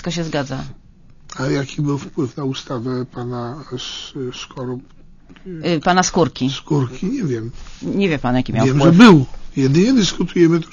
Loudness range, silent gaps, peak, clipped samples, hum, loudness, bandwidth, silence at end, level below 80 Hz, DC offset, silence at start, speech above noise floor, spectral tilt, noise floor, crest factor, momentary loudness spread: 12 LU; none; 0 dBFS; 0.1%; none; -17 LUFS; 7.4 kHz; 0 s; -40 dBFS; under 0.1%; 0 s; 23 dB; -6 dB/octave; -40 dBFS; 18 dB; 15 LU